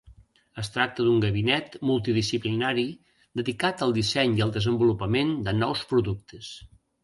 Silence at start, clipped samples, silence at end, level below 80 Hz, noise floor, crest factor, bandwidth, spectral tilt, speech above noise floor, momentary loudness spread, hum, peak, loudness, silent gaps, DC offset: 0.05 s; under 0.1%; 0.35 s; -52 dBFS; -54 dBFS; 18 dB; 11.5 kHz; -6 dB/octave; 29 dB; 13 LU; none; -8 dBFS; -25 LUFS; none; under 0.1%